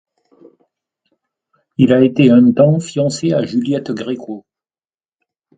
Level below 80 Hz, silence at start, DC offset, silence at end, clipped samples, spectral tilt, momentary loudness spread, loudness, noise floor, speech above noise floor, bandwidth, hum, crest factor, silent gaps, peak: -56 dBFS; 1.8 s; under 0.1%; 1.2 s; under 0.1%; -7 dB/octave; 17 LU; -14 LUFS; under -90 dBFS; over 77 dB; 9.2 kHz; none; 16 dB; none; 0 dBFS